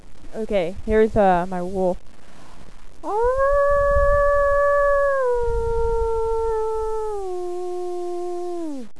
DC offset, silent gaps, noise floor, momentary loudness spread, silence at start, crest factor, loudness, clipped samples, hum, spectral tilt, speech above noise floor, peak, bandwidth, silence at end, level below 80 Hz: 3%; none; -42 dBFS; 11 LU; 0 s; 16 dB; -21 LUFS; under 0.1%; none; -7 dB/octave; 22 dB; -6 dBFS; 11 kHz; 0.15 s; -32 dBFS